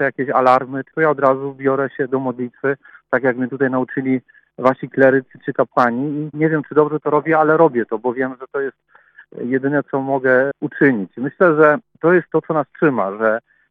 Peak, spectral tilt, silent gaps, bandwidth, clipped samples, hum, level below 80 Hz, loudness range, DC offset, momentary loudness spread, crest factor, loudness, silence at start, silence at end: 0 dBFS; -9.5 dB/octave; none; 6.2 kHz; under 0.1%; none; -70 dBFS; 3 LU; under 0.1%; 9 LU; 18 dB; -18 LUFS; 0 s; 0.3 s